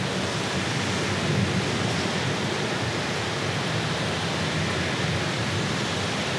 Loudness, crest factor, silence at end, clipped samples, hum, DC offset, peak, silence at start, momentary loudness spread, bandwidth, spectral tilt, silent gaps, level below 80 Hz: -25 LUFS; 14 dB; 0 s; under 0.1%; none; under 0.1%; -12 dBFS; 0 s; 2 LU; 13.5 kHz; -4.5 dB/octave; none; -50 dBFS